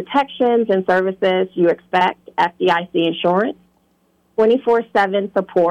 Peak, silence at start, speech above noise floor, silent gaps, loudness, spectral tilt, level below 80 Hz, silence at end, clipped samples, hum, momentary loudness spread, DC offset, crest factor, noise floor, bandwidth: -4 dBFS; 0 s; 44 dB; none; -17 LUFS; -7 dB/octave; -62 dBFS; 0 s; under 0.1%; none; 4 LU; under 0.1%; 12 dB; -61 dBFS; 8.6 kHz